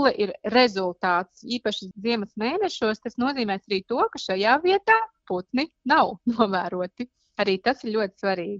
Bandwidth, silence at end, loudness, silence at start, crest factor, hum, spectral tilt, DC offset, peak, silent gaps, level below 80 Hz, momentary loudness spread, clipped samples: 7.8 kHz; 0 s; -24 LUFS; 0 s; 20 dB; none; -5 dB/octave; under 0.1%; -4 dBFS; none; -64 dBFS; 9 LU; under 0.1%